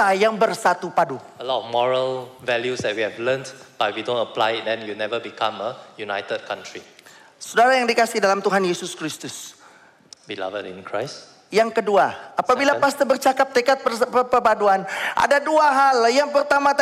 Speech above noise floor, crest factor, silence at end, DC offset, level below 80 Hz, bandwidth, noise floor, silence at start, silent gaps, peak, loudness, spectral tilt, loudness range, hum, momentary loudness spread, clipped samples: 30 dB; 14 dB; 0 s; under 0.1%; -64 dBFS; 16 kHz; -50 dBFS; 0 s; none; -6 dBFS; -20 LUFS; -3.5 dB/octave; 8 LU; none; 14 LU; under 0.1%